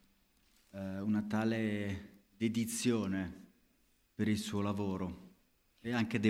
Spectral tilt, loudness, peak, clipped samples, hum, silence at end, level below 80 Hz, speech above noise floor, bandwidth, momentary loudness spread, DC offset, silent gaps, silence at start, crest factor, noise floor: -5.5 dB/octave; -37 LUFS; -16 dBFS; under 0.1%; none; 0 s; -66 dBFS; 38 dB; 16 kHz; 13 LU; under 0.1%; none; 0.75 s; 20 dB; -73 dBFS